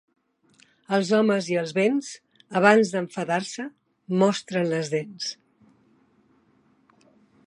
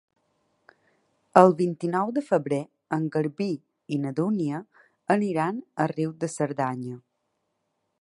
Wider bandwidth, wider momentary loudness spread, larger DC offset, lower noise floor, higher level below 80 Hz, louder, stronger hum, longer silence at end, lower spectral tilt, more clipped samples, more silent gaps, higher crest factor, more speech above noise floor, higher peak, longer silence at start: about the same, 11.5 kHz vs 11.5 kHz; about the same, 16 LU vs 14 LU; neither; second, -63 dBFS vs -77 dBFS; about the same, -76 dBFS vs -74 dBFS; about the same, -24 LUFS vs -26 LUFS; neither; first, 2.15 s vs 1.05 s; second, -5 dB/octave vs -7 dB/octave; neither; neither; about the same, 24 dB vs 26 dB; second, 40 dB vs 52 dB; about the same, -2 dBFS vs 0 dBFS; second, 0.9 s vs 1.35 s